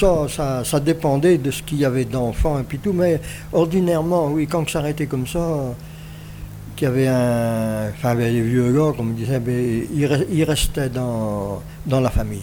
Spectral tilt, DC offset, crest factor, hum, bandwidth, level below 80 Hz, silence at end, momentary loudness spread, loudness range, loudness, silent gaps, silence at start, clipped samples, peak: -6.5 dB/octave; under 0.1%; 16 dB; none; over 20 kHz; -34 dBFS; 0 s; 8 LU; 3 LU; -20 LUFS; none; 0 s; under 0.1%; -4 dBFS